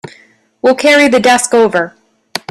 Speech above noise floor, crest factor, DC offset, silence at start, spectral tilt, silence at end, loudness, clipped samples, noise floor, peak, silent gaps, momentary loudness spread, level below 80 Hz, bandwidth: 38 dB; 12 dB; under 0.1%; 0.65 s; -3 dB/octave; 0.15 s; -10 LUFS; under 0.1%; -47 dBFS; 0 dBFS; none; 16 LU; -52 dBFS; 14.5 kHz